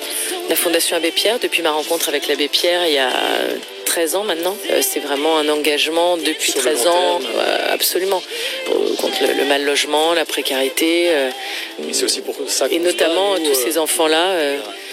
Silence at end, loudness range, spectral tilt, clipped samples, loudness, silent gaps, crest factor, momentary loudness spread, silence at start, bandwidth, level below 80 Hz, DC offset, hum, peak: 0 s; 1 LU; 0 dB/octave; under 0.1%; -17 LUFS; none; 16 dB; 6 LU; 0 s; 17 kHz; -82 dBFS; under 0.1%; none; -2 dBFS